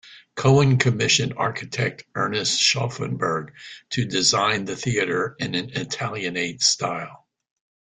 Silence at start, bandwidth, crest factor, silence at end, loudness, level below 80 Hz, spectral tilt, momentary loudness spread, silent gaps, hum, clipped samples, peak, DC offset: 0.05 s; 9.6 kHz; 20 dB; 0.8 s; -22 LUFS; -56 dBFS; -3.5 dB/octave; 10 LU; none; none; under 0.1%; -4 dBFS; under 0.1%